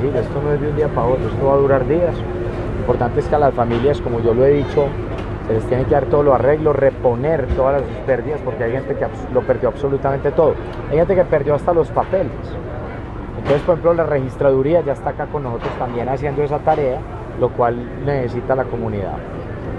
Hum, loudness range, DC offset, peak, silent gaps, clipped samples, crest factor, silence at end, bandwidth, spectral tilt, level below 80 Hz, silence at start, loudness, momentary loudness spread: none; 3 LU; under 0.1%; 0 dBFS; none; under 0.1%; 16 dB; 0 s; 8.8 kHz; -9 dB/octave; -32 dBFS; 0 s; -18 LUFS; 10 LU